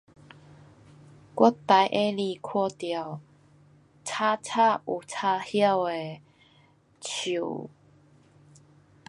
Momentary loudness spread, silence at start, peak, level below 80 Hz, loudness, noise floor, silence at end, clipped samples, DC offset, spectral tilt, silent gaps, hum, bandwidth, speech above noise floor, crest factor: 18 LU; 1.35 s; -4 dBFS; -72 dBFS; -26 LUFS; -61 dBFS; 1.4 s; under 0.1%; under 0.1%; -4.5 dB/octave; none; none; 11.5 kHz; 35 dB; 24 dB